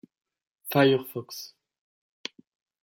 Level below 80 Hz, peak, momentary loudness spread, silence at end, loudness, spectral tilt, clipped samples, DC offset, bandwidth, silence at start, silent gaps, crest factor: -72 dBFS; -8 dBFS; 20 LU; 1.4 s; -25 LUFS; -5.5 dB/octave; under 0.1%; under 0.1%; 17 kHz; 0.65 s; none; 22 dB